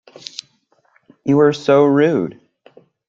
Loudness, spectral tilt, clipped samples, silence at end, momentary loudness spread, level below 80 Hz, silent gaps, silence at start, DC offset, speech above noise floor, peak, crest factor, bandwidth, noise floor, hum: -15 LUFS; -7 dB/octave; under 0.1%; 0.75 s; 19 LU; -64 dBFS; none; 1.25 s; under 0.1%; 47 dB; -2 dBFS; 16 dB; 7.6 kHz; -60 dBFS; none